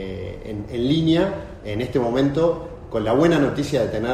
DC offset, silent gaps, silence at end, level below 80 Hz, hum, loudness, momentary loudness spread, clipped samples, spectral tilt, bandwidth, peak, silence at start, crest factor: under 0.1%; none; 0 s; -42 dBFS; none; -21 LUFS; 13 LU; under 0.1%; -7 dB/octave; 13.5 kHz; -4 dBFS; 0 s; 16 dB